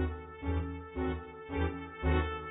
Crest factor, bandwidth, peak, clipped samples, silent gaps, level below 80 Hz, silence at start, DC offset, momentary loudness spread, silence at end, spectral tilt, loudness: 16 dB; 4 kHz; -18 dBFS; under 0.1%; none; -38 dBFS; 0 s; under 0.1%; 8 LU; 0 s; -10.5 dB/octave; -36 LUFS